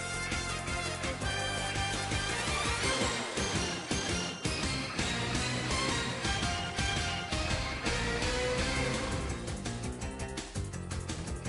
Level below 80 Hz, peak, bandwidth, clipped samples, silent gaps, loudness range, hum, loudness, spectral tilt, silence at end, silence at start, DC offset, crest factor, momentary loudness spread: -42 dBFS; -18 dBFS; 11.5 kHz; under 0.1%; none; 2 LU; none; -33 LUFS; -3.5 dB/octave; 0 s; 0 s; under 0.1%; 16 dB; 7 LU